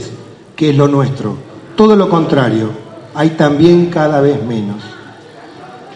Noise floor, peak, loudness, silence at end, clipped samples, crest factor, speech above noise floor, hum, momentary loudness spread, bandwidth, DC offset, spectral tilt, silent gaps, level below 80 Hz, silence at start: -34 dBFS; 0 dBFS; -12 LUFS; 0 s; 0.5%; 12 dB; 24 dB; none; 22 LU; 9.8 kHz; under 0.1%; -7.5 dB/octave; none; -50 dBFS; 0 s